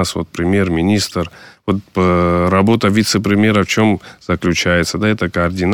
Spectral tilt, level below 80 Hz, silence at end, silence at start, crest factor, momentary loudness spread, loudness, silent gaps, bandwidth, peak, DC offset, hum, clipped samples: -5.5 dB/octave; -38 dBFS; 0 s; 0 s; 12 dB; 8 LU; -15 LUFS; none; 18 kHz; -2 dBFS; under 0.1%; none; under 0.1%